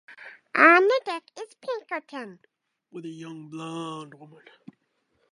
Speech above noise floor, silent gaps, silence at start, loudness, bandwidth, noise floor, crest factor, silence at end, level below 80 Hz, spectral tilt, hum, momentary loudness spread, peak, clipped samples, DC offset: 47 dB; none; 0.1 s; -22 LUFS; 11.5 kHz; -72 dBFS; 24 dB; 1.05 s; -86 dBFS; -5 dB/octave; none; 28 LU; -4 dBFS; under 0.1%; under 0.1%